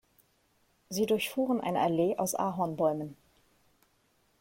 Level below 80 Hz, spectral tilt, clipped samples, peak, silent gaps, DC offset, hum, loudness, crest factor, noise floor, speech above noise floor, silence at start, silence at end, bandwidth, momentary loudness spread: -70 dBFS; -5 dB/octave; under 0.1%; -14 dBFS; none; under 0.1%; none; -30 LUFS; 18 dB; -71 dBFS; 41 dB; 0.9 s; 1.3 s; 16.5 kHz; 8 LU